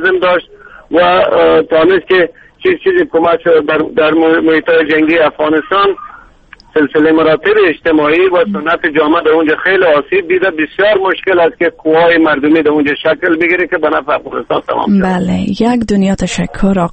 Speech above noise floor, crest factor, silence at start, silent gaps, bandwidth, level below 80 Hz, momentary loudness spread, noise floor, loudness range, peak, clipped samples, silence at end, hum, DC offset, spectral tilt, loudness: 30 dB; 10 dB; 0 s; none; 8.8 kHz; -38 dBFS; 6 LU; -40 dBFS; 2 LU; 0 dBFS; under 0.1%; 0 s; none; under 0.1%; -6 dB/octave; -10 LUFS